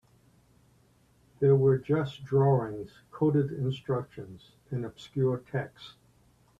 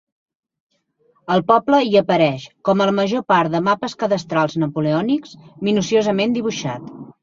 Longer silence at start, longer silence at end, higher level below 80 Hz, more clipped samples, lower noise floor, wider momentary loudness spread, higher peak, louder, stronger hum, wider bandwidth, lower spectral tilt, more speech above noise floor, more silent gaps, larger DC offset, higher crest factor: about the same, 1.4 s vs 1.3 s; first, 0.7 s vs 0.1 s; about the same, -64 dBFS vs -60 dBFS; neither; about the same, -64 dBFS vs -62 dBFS; first, 20 LU vs 10 LU; second, -12 dBFS vs -2 dBFS; second, -29 LUFS vs -18 LUFS; neither; about the same, 7.4 kHz vs 7.6 kHz; first, -9 dB/octave vs -6 dB/octave; second, 36 dB vs 44 dB; neither; neither; about the same, 18 dB vs 18 dB